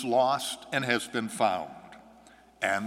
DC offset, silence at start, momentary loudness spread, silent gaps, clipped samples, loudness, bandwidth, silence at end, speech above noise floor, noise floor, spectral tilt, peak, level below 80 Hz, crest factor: under 0.1%; 0 s; 11 LU; none; under 0.1%; -29 LUFS; 16 kHz; 0 s; 28 dB; -56 dBFS; -3.5 dB/octave; -8 dBFS; -70 dBFS; 22 dB